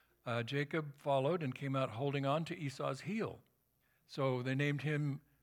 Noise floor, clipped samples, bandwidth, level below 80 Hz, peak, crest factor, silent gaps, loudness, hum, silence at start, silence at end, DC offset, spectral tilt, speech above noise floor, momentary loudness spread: -77 dBFS; under 0.1%; 13.5 kHz; -80 dBFS; -20 dBFS; 18 dB; none; -38 LUFS; none; 0.25 s; 0.2 s; under 0.1%; -7 dB/octave; 40 dB; 6 LU